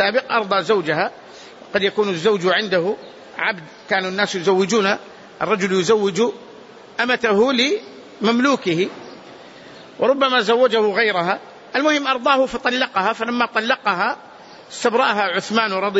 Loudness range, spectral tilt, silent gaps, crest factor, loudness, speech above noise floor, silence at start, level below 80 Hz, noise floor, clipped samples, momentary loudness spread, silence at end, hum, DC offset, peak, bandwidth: 2 LU; -4 dB/octave; none; 16 dB; -19 LUFS; 23 dB; 0 s; -62 dBFS; -41 dBFS; under 0.1%; 10 LU; 0 s; none; under 0.1%; -4 dBFS; 8 kHz